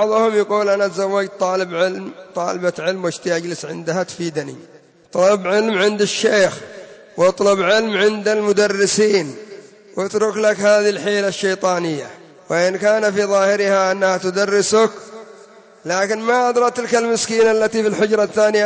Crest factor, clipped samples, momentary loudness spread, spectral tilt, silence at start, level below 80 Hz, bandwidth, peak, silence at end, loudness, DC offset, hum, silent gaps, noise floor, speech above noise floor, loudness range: 14 dB; under 0.1%; 11 LU; -3.5 dB/octave; 0 s; -66 dBFS; 8 kHz; -4 dBFS; 0 s; -17 LUFS; under 0.1%; none; none; -44 dBFS; 27 dB; 4 LU